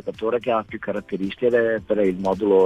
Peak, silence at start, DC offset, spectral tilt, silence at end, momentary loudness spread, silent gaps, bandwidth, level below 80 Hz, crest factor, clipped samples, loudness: -6 dBFS; 0.05 s; under 0.1%; -7.5 dB/octave; 0 s; 9 LU; none; 7.8 kHz; -54 dBFS; 14 dB; under 0.1%; -23 LUFS